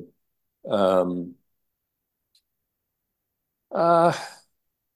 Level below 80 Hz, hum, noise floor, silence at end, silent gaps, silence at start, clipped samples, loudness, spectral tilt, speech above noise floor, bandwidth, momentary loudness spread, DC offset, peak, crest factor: -66 dBFS; none; -81 dBFS; 0.6 s; none; 0 s; under 0.1%; -23 LUFS; -6.5 dB/octave; 59 dB; 12.5 kHz; 21 LU; under 0.1%; -6 dBFS; 20 dB